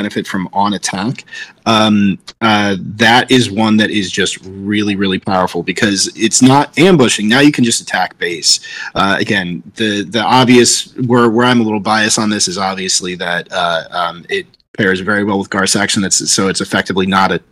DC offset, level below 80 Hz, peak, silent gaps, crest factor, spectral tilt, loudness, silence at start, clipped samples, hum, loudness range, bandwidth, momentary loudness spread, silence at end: under 0.1%; -52 dBFS; 0 dBFS; 14.68-14.74 s; 12 dB; -3.5 dB/octave; -12 LUFS; 0 s; under 0.1%; none; 4 LU; 16.5 kHz; 9 LU; 0.15 s